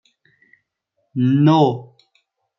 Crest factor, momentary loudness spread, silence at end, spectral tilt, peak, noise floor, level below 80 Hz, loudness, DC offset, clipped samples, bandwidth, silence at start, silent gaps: 18 dB; 17 LU; 0.75 s; -9 dB/octave; -2 dBFS; -72 dBFS; -66 dBFS; -16 LUFS; under 0.1%; under 0.1%; 6.2 kHz; 1.15 s; none